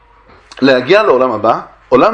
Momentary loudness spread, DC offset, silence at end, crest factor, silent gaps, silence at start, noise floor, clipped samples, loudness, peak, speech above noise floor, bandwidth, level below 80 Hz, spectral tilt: 6 LU; under 0.1%; 0 s; 12 dB; none; 0.6 s; -44 dBFS; 0.2%; -11 LUFS; 0 dBFS; 33 dB; 8.6 kHz; -48 dBFS; -6 dB/octave